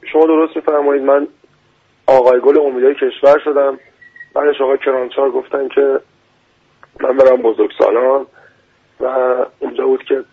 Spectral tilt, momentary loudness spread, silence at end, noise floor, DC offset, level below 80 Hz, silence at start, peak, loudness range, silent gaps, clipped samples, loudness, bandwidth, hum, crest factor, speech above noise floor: -6 dB/octave; 10 LU; 0.1 s; -55 dBFS; under 0.1%; -58 dBFS; 0.05 s; 0 dBFS; 4 LU; none; under 0.1%; -14 LUFS; 6.2 kHz; none; 14 dB; 43 dB